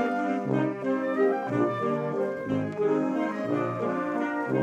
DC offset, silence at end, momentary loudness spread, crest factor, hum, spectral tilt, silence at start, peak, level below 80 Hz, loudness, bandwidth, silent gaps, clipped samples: under 0.1%; 0 s; 4 LU; 14 dB; none; -8 dB/octave; 0 s; -12 dBFS; -72 dBFS; -28 LUFS; 9 kHz; none; under 0.1%